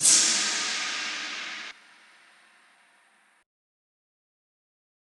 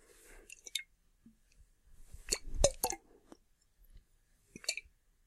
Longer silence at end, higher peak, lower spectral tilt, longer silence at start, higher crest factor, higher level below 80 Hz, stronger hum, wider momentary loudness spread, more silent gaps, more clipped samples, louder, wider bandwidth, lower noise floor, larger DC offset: first, 3.45 s vs 0.45 s; first, -6 dBFS vs -12 dBFS; second, 2 dB/octave vs -1.5 dB/octave; second, 0 s vs 0.3 s; about the same, 26 dB vs 30 dB; second, -86 dBFS vs -48 dBFS; neither; second, 18 LU vs 27 LU; neither; neither; first, -24 LUFS vs -37 LUFS; second, 13 kHz vs 16 kHz; second, -63 dBFS vs -70 dBFS; neither